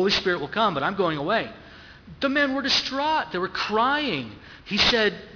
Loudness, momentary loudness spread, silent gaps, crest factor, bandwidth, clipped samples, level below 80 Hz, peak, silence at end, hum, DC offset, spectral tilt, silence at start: -23 LUFS; 9 LU; none; 20 dB; 5.4 kHz; under 0.1%; -52 dBFS; -4 dBFS; 0 s; none; under 0.1%; -4 dB/octave; 0 s